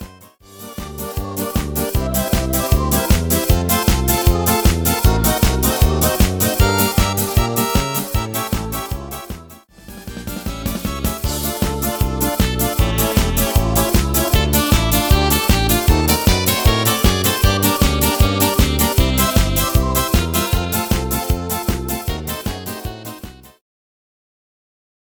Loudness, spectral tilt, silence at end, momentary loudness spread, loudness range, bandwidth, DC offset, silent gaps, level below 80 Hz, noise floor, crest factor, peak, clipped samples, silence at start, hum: -17 LUFS; -4.5 dB/octave; 1.75 s; 12 LU; 9 LU; over 20 kHz; under 0.1%; none; -22 dBFS; -43 dBFS; 16 dB; 0 dBFS; under 0.1%; 0 s; none